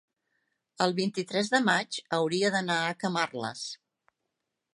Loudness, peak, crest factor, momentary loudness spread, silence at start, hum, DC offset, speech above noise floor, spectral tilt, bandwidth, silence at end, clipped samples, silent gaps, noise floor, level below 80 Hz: -28 LUFS; -8 dBFS; 22 dB; 10 LU; 0.8 s; none; under 0.1%; 55 dB; -4 dB/octave; 11.5 kHz; 1 s; under 0.1%; none; -84 dBFS; -78 dBFS